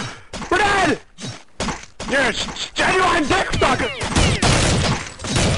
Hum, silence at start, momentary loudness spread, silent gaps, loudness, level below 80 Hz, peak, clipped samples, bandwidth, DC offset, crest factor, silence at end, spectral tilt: none; 0 s; 14 LU; none; -18 LUFS; -32 dBFS; -4 dBFS; under 0.1%; 11.5 kHz; 0.6%; 14 dB; 0 s; -4 dB/octave